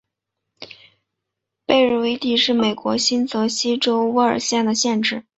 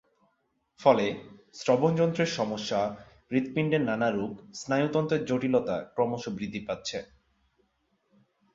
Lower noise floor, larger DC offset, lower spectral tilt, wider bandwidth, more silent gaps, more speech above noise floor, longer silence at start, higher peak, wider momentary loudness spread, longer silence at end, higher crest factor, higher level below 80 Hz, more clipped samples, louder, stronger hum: first, -81 dBFS vs -74 dBFS; neither; second, -3 dB/octave vs -6 dB/octave; about the same, 8.2 kHz vs 7.8 kHz; neither; first, 62 dB vs 47 dB; second, 0.6 s vs 0.8 s; first, -2 dBFS vs -8 dBFS; second, 6 LU vs 11 LU; second, 0.2 s vs 1.5 s; about the same, 18 dB vs 22 dB; about the same, -62 dBFS vs -64 dBFS; neither; first, -18 LUFS vs -28 LUFS; neither